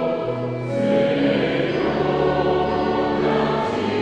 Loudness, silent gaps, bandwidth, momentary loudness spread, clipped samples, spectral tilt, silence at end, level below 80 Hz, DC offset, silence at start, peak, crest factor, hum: -21 LUFS; none; 9.4 kHz; 5 LU; under 0.1%; -7.5 dB/octave; 0 s; -44 dBFS; under 0.1%; 0 s; -6 dBFS; 14 dB; none